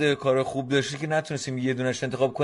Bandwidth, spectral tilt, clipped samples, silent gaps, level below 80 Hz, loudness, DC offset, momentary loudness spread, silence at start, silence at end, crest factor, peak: 11.5 kHz; -5 dB/octave; under 0.1%; none; -62 dBFS; -26 LUFS; under 0.1%; 4 LU; 0 s; 0 s; 16 dB; -10 dBFS